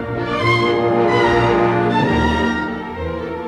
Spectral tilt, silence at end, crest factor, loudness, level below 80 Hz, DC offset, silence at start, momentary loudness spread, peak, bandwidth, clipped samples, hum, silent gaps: -6.5 dB/octave; 0 s; 14 dB; -17 LUFS; -34 dBFS; under 0.1%; 0 s; 10 LU; -4 dBFS; 10.5 kHz; under 0.1%; none; none